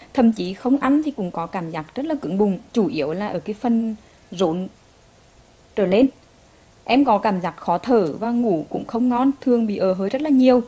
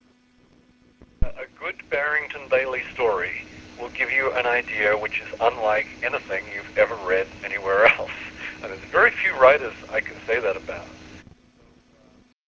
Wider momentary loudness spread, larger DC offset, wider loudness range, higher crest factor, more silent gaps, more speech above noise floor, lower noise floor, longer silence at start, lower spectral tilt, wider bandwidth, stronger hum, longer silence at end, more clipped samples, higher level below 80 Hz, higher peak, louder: second, 10 LU vs 17 LU; neither; about the same, 4 LU vs 6 LU; about the same, 18 dB vs 22 dB; neither; second, 32 dB vs 36 dB; second, -52 dBFS vs -58 dBFS; second, 0 s vs 1.2 s; first, -7.5 dB/octave vs -4.5 dB/octave; about the same, 7.8 kHz vs 7.4 kHz; neither; second, 0 s vs 1.25 s; neither; second, -56 dBFS vs -44 dBFS; about the same, -4 dBFS vs -2 dBFS; about the same, -21 LUFS vs -22 LUFS